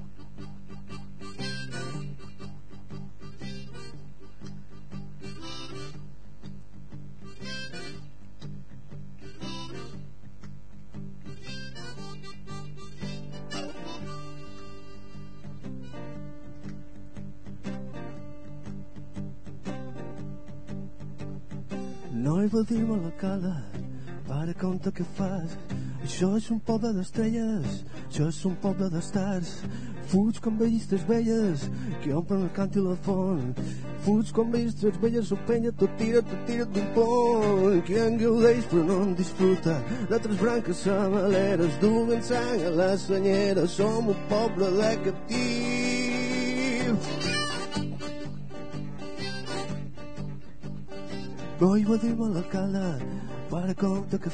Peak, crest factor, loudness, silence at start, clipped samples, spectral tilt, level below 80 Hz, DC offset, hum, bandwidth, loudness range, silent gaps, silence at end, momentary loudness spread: -8 dBFS; 20 dB; -28 LUFS; 0 s; under 0.1%; -6.5 dB/octave; -52 dBFS; 2%; none; 9.8 kHz; 18 LU; none; 0 s; 21 LU